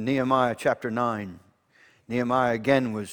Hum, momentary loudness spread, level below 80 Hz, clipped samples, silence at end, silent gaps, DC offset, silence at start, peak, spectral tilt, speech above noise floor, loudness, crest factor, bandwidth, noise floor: none; 9 LU; -62 dBFS; under 0.1%; 0 s; none; under 0.1%; 0 s; -8 dBFS; -6.5 dB/octave; 35 dB; -25 LUFS; 18 dB; 19 kHz; -60 dBFS